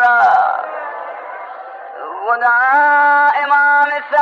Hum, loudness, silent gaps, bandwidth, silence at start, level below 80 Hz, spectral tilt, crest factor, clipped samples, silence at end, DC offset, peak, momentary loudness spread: none; -12 LUFS; none; 6.8 kHz; 0 s; -70 dBFS; -2.5 dB/octave; 10 dB; under 0.1%; 0 s; under 0.1%; -4 dBFS; 19 LU